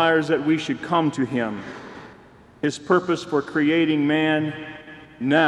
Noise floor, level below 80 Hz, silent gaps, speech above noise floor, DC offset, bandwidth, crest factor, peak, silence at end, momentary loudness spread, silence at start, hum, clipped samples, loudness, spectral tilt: -48 dBFS; -62 dBFS; none; 27 dB; under 0.1%; 10 kHz; 18 dB; -4 dBFS; 0 s; 18 LU; 0 s; none; under 0.1%; -22 LUFS; -6 dB/octave